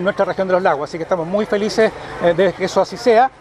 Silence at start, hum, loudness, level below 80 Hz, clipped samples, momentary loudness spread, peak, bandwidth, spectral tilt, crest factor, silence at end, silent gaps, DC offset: 0 s; none; -17 LUFS; -50 dBFS; under 0.1%; 5 LU; -2 dBFS; 13.5 kHz; -5.5 dB/octave; 16 dB; 0.1 s; none; under 0.1%